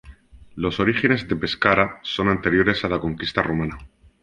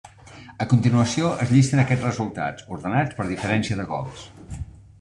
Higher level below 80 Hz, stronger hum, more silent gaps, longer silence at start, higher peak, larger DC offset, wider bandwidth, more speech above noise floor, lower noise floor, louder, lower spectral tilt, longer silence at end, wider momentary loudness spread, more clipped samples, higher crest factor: about the same, -44 dBFS vs -48 dBFS; neither; neither; about the same, 0.05 s vs 0.05 s; about the same, -2 dBFS vs -4 dBFS; neither; about the same, 10.5 kHz vs 10.5 kHz; about the same, 24 dB vs 23 dB; about the same, -45 dBFS vs -45 dBFS; about the same, -21 LUFS vs -22 LUFS; about the same, -6.5 dB/octave vs -6.5 dB/octave; about the same, 0.35 s vs 0.35 s; second, 8 LU vs 19 LU; neither; about the same, 20 dB vs 18 dB